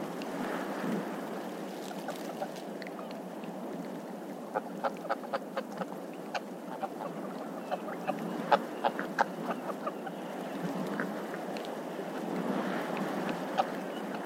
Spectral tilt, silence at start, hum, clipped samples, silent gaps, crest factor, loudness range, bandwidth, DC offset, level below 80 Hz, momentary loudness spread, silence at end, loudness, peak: -5.5 dB/octave; 0 s; none; under 0.1%; none; 28 dB; 5 LU; 16 kHz; under 0.1%; -84 dBFS; 8 LU; 0 s; -36 LUFS; -8 dBFS